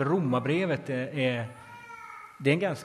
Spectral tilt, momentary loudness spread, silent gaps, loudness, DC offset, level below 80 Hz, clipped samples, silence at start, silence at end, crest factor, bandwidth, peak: -7 dB/octave; 18 LU; none; -28 LUFS; under 0.1%; -68 dBFS; under 0.1%; 0 s; 0 s; 20 dB; 13 kHz; -10 dBFS